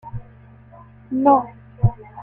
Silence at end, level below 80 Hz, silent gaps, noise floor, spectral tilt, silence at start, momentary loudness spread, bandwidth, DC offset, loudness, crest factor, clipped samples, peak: 0 s; -40 dBFS; none; -46 dBFS; -12.5 dB/octave; 0.05 s; 20 LU; 3.1 kHz; under 0.1%; -19 LUFS; 18 dB; under 0.1%; -4 dBFS